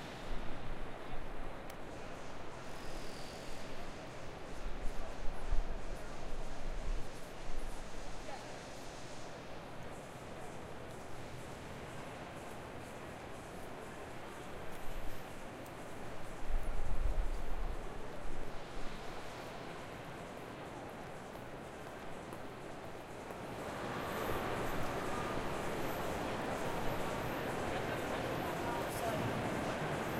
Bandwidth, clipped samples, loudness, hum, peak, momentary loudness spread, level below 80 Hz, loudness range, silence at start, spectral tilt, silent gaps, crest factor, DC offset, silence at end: 14.5 kHz; under 0.1%; -44 LUFS; none; -18 dBFS; 10 LU; -44 dBFS; 9 LU; 0 s; -5 dB/octave; none; 20 dB; under 0.1%; 0 s